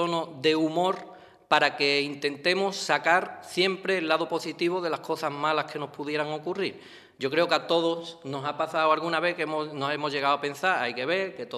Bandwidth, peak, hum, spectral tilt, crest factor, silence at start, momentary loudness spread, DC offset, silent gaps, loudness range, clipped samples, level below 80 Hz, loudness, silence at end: 14.5 kHz; -6 dBFS; none; -4 dB/octave; 22 dB; 0 s; 9 LU; under 0.1%; none; 4 LU; under 0.1%; -76 dBFS; -27 LUFS; 0 s